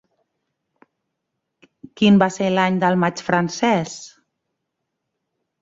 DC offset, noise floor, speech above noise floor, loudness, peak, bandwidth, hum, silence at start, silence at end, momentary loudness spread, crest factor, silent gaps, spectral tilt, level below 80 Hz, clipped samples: under 0.1%; -78 dBFS; 60 dB; -18 LUFS; -2 dBFS; 7.8 kHz; none; 2 s; 1.55 s; 7 LU; 20 dB; none; -5.5 dB/octave; -62 dBFS; under 0.1%